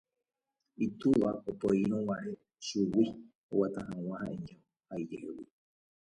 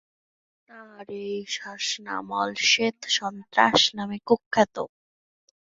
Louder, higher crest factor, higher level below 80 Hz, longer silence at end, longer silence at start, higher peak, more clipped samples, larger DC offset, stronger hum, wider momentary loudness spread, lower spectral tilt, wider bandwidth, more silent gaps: second, -34 LUFS vs -24 LUFS; second, 18 dB vs 24 dB; about the same, -66 dBFS vs -66 dBFS; second, 0.6 s vs 0.85 s; about the same, 0.8 s vs 0.75 s; second, -16 dBFS vs -2 dBFS; neither; neither; neither; about the same, 15 LU vs 15 LU; first, -7 dB/octave vs -2 dB/octave; first, 11 kHz vs 8 kHz; first, 3.35-3.49 s vs 4.46-4.51 s